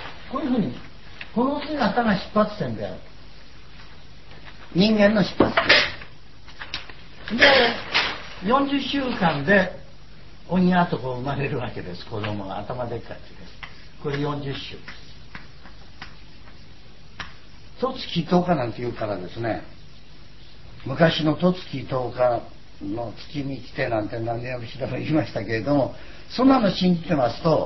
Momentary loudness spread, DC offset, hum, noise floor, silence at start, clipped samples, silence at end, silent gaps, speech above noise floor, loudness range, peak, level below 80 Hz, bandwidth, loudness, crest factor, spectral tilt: 22 LU; 1%; none; -47 dBFS; 0 s; under 0.1%; 0 s; none; 25 dB; 13 LU; 0 dBFS; -48 dBFS; 6.2 kHz; -23 LUFS; 24 dB; -6.5 dB/octave